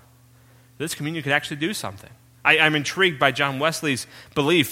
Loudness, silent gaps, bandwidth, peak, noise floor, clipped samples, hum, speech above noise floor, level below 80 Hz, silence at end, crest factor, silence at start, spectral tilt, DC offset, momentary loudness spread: -21 LUFS; none; 16.5 kHz; 0 dBFS; -53 dBFS; under 0.1%; none; 31 dB; -60 dBFS; 0 s; 22 dB; 0.8 s; -4 dB/octave; under 0.1%; 13 LU